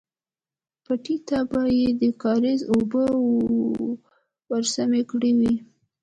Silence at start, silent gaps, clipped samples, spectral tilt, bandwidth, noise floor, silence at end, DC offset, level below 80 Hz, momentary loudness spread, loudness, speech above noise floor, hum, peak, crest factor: 0.9 s; none; under 0.1%; -5 dB/octave; 9.2 kHz; under -90 dBFS; 0.4 s; under 0.1%; -56 dBFS; 8 LU; -23 LUFS; over 68 dB; none; -10 dBFS; 12 dB